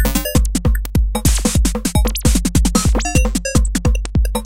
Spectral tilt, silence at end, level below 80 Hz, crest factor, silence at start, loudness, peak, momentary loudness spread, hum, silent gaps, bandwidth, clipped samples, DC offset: -4.5 dB/octave; 0 s; -18 dBFS; 14 dB; 0 s; -17 LUFS; 0 dBFS; 3 LU; none; none; 17 kHz; under 0.1%; 2%